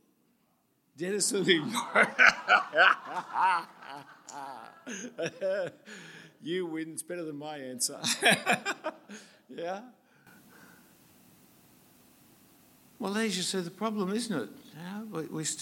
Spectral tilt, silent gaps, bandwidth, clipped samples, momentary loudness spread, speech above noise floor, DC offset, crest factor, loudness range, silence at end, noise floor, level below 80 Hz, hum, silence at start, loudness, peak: -2.5 dB/octave; none; 17 kHz; under 0.1%; 23 LU; 41 dB; under 0.1%; 26 dB; 18 LU; 0 s; -72 dBFS; -78 dBFS; none; 1 s; -28 LUFS; -6 dBFS